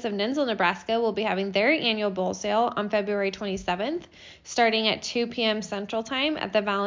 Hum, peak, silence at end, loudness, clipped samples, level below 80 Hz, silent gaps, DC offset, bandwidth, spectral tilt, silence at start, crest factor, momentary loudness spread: none; -8 dBFS; 0 s; -26 LUFS; under 0.1%; -58 dBFS; none; under 0.1%; 7.6 kHz; -4 dB/octave; 0 s; 18 dB; 8 LU